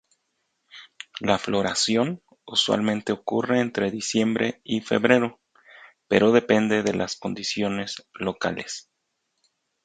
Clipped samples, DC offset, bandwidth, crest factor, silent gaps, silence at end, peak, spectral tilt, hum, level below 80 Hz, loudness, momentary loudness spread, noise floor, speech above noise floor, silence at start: under 0.1%; under 0.1%; 9.4 kHz; 24 dB; none; 1.05 s; -2 dBFS; -4 dB/octave; none; -60 dBFS; -24 LUFS; 11 LU; -76 dBFS; 53 dB; 0.75 s